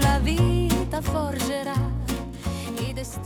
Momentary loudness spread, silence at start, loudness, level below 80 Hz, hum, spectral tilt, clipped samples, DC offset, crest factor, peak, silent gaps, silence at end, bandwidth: 9 LU; 0 s; -26 LUFS; -30 dBFS; none; -5.5 dB/octave; under 0.1%; under 0.1%; 16 dB; -8 dBFS; none; 0 s; 19.5 kHz